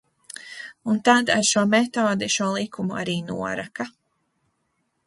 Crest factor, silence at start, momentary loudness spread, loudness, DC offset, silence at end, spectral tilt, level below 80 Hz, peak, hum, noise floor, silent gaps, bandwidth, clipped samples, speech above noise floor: 22 dB; 0.35 s; 18 LU; -22 LUFS; under 0.1%; 1.15 s; -3.5 dB/octave; -62 dBFS; -2 dBFS; none; -73 dBFS; none; 11.5 kHz; under 0.1%; 51 dB